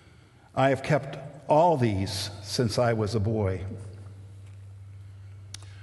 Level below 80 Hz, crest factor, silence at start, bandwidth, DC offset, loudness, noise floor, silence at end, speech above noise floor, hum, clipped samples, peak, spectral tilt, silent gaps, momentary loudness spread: -48 dBFS; 20 dB; 0.55 s; 12.5 kHz; under 0.1%; -26 LUFS; -54 dBFS; 0 s; 29 dB; none; under 0.1%; -8 dBFS; -6 dB/octave; none; 24 LU